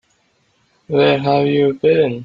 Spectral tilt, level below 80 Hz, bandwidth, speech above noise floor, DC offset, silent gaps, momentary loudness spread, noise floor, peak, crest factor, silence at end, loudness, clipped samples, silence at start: -8.5 dB/octave; -56 dBFS; 5.2 kHz; 47 dB; under 0.1%; none; 2 LU; -61 dBFS; -2 dBFS; 16 dB; 0 s; -15 LUFS; under 0.1%; 0.9 s